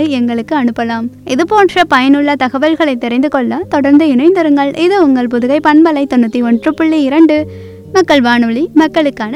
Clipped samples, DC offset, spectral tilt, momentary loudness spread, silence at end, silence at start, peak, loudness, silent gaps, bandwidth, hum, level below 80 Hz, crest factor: 1%; under 0.1%; -5.5 dB/octave; 6 LU; 0 s; 0 s; 0 dBFS; -10 LUFS; none; 11 kHz; none; -48 dBFS; 10 dB